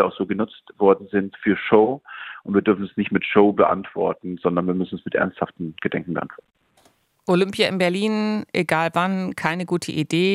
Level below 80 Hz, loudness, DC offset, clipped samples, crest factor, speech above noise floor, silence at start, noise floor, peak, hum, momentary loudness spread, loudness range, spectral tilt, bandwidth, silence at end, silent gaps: -62 dBFS; -21 LUFS; under 0.1%; under 0.1%; 20 dB; 39 dB; 0 s; -60 dBFS; -2 dBFS; none; 11 LU; 5 LU; -6 dB/octave; 14.5 kHz; 0 s; none